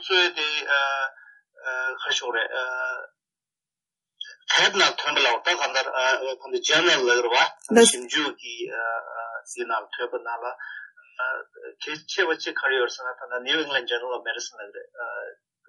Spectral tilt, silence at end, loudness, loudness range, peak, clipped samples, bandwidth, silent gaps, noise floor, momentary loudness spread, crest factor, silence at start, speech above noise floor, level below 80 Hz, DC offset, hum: -1 dB/octave; 0.35 s; -23 LUFS; 9 LU; -4 dBFS; under 0.1%; 11.5 kHz; none; under -90 dBFS; 17 LU; 22 dB; 0 s; over 65 dB; -78 dBFS; under 0.1%; none